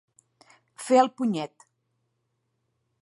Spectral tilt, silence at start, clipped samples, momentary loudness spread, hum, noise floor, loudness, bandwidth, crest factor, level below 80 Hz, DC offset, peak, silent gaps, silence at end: -5 dB/octave; 0.8 s; under 0.1%; 18 LU; none; -76 dBFS; -24 LUFS; 11.5 kHz; 24 dB; -84 dBFS; under 0.1%; -6 dBFS; none; 1.55 s